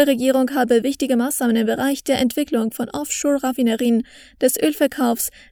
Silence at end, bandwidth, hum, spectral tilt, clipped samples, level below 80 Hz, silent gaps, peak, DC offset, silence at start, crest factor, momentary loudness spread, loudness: 0.2 s; over 20 kHz; none; -3.5 dB/octave; under 0.1%; -56 dBFS; none; -2 dBFS; under 0.1%; 0 s; 16 dB; 5 LU; -19 LUFS